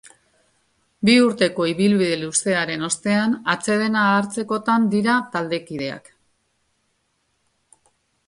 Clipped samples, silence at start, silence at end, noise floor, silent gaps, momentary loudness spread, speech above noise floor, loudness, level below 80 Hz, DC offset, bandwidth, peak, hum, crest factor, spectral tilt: under 0.1%; 1 s; 2.3 s; -69 dBFS; none; 10 LU; 50 dB; -20 LUFS; -62 dBFS; under 0.1%; 11.5 kHz; -2 dBFS; none; 18 dB; -4 dB/octave